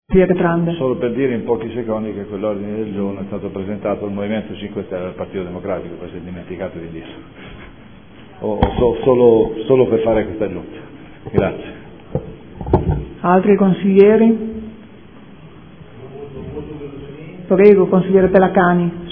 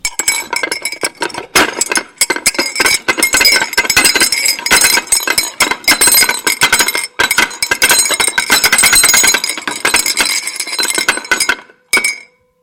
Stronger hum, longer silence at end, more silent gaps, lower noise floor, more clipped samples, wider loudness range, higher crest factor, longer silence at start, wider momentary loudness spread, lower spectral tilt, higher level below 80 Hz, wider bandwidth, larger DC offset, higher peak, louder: neither; second, 0 s vs 0.4 s; neither; first, -41 dBFS vs -35 dBFS; neither; first, 12 LU vs 3 LU; first, 18 dB vs 12 dB; about the same, 0.1 s vs 0.05 s; first, 22 LU vs 10 LU; first, -11.5 dB/octave vs 1 dB/octave; first, -36 dBFS vs -42 dBFS; second, 3.7 kHz vs over 20 kHz; first, 0.5% vs under 0.1%; about the same, 0 dBFS vs 0 dBFS; second, -16 LUFS vs -10 LUFS